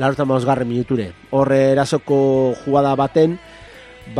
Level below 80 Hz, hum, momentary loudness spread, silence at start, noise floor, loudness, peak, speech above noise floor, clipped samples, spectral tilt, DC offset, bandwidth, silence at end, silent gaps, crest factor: -50 dBFS; none; 7 LU; 0 s; -40 dBFS; -17 LUFS; -2 dBFS; 24 dB; under 0.1%; -7 dB/octave; under 0.1%; 11 kHz; 0 s; none; 16 dB